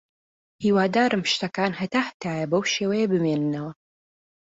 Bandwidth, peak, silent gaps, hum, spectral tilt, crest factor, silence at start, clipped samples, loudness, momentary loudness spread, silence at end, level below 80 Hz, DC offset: 8 kHz; -8 dBFS; 2.14-2.20 s; none; -5 dB/octave; 16 dB; 0.6 s; under 0.1%; -24 LUFS; 8 LU; 0.8 s; -64 dBFS; under 0.1%